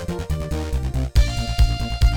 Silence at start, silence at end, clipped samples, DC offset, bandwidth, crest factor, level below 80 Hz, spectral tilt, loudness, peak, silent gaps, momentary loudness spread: 0 s; 0 s; under 0.1%; under 0.1%; 16 kHz; 14 dB; -20 dBFS; -5.5 dB/octave; -23 LUFS; -4 dBFS; none; 5 LU